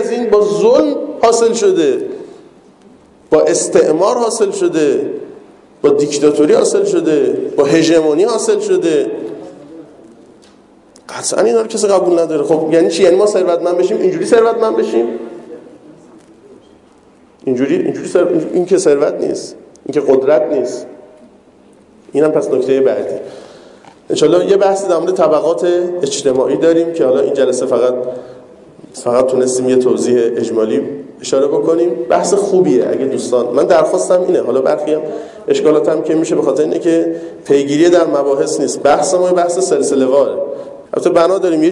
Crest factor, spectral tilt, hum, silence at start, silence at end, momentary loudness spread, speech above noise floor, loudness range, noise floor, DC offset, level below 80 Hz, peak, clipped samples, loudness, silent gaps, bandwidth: 12 dB; -4.5 dB/octave; none; 0 s; 0 s; 10 LU; 33 dB; 5 LU; -46 dBFS; under 0.1%; -58 dBFS; 0 dBFS; under 0.1%; -13 LUFS; none; 11.5 kHz